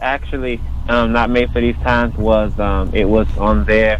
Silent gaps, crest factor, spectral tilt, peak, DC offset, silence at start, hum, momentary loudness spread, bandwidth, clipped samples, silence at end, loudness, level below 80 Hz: none; 12 dB; -8 dB/octave; -2 dBFS; under 0.1%; 0 s; none; 7 LU; 7.2 kHz; under 0.1%; 0 s; -16 LUFS; -20 dBFS